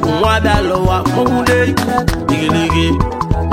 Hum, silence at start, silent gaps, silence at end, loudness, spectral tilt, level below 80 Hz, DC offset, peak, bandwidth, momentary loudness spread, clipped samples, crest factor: none; 0 s; none; 0 s; -14 LUFS; -6 dB/octave; -24 dBFS; under 0.1%; 0 dBFS; 16.5 kHz; 4 LU; under 0.1%; 12 dB